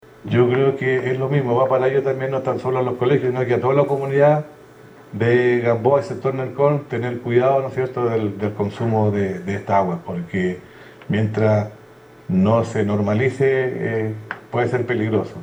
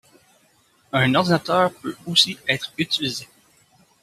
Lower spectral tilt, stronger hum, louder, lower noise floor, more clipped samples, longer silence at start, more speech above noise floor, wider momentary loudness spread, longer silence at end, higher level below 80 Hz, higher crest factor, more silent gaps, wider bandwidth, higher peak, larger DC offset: first, -8.5 dB/octave vs -4 dB/octave; neither; about the same, -20 LUFS vs -20 LUFS; second, -45 dBFS vs -60 dBFS; neither; second, 0.25 s vs 0.95 s; second, 26 dB vs 39 dB; about the same, 8 LU vs 9 LU; second, 0 s vs 0.8 s; about the same, -62 dBFS vs -62 dBFS; second, 16 dB vs 22 dB; neither; first, over 20 kHz vs 14.5 kHz; about the same, -2 dBFS vs -2 dBFS; neither